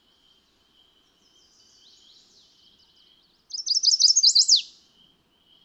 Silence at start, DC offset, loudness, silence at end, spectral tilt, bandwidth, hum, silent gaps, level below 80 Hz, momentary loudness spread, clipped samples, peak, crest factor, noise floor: 3.55 s; under 0.1%; -17 LUFS; 1 s; 5.5 dB/octave; 11.5 kHz; none; none; -78 dBFS; 20 LU; under 0.1%; -6 dBFS; 20 dB; -63 dBFS